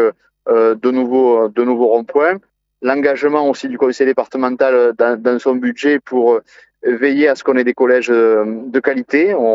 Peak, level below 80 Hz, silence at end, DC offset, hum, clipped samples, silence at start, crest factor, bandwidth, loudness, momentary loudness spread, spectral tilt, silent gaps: 0 dBFS; -70 dBFS; 0 s; under 0.1%; none; under 0.1%; 0 s; 14 dB; 7.8 kHz; -14 LUFS; 6 LU; -5.5 dB/octave; none